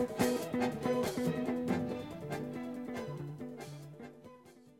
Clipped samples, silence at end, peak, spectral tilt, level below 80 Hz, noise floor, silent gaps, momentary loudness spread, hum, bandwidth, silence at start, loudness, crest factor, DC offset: under 0.1%; 0.05 s; -18 dBFS; -6 dB/octave; -66 dBFS; -58 dBFS; none; 17 LU; none; 16 kHz; 0 s; -37 LUFS; 20 dB; under 0.1%